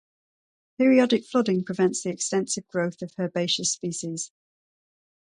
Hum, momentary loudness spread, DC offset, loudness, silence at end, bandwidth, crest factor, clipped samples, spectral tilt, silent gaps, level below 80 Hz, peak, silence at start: none; 11 LU; under 0.1%; -25 LUFS; 1.05 s; 11 kHz; 20 dB; under 0.1%; -4 dB/octave; none; -72 dBFS; -6 dBFS; 0.8 s